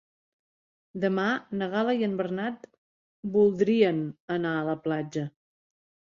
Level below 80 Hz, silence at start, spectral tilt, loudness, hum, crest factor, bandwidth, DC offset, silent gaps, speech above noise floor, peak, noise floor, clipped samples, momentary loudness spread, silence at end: -70 dBFS; 0.95 s; -7.5 dB/octave; -27 LUFS; none; 20 dB; 7.2 kHz; under 0.1%; 2.78-3.23 s, 4.20-4.28 s; over 63 dB; -10 dBFS; under -90 dBFS; under 0.1%; 12 LU; 0.85 s